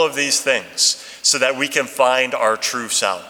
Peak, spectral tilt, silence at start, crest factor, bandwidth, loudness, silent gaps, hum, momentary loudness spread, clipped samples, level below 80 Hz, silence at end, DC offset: 0 dBFS; 0 dB/octave; 0 s; 18 dB; 19 kHz; -17 LUFS; none; none; 4 LU; under 0.1%; -70 dBFS; 0 s; under 0.1%